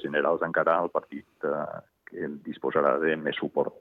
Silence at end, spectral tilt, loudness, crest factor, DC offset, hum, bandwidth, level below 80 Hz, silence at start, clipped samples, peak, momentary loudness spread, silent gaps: 0.05 s; -8 dB/octave; -28 LUFS; 20 dB; under 0.1%; none; 4.2 kHz; -72 dBFS; 0 s; under 0.1%; -8 dBFS; 13 LU; none